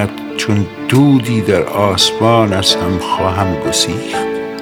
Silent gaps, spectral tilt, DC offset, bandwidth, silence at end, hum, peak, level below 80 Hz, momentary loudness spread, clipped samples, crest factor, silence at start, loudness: none; -4.5 dB/octave; under 0.1%; 19 kHz; 0 s; none; 0 dBFS; -42 dBFS; 8 LU; under 0.1%; 14 dB; 0 s; -13 LUFS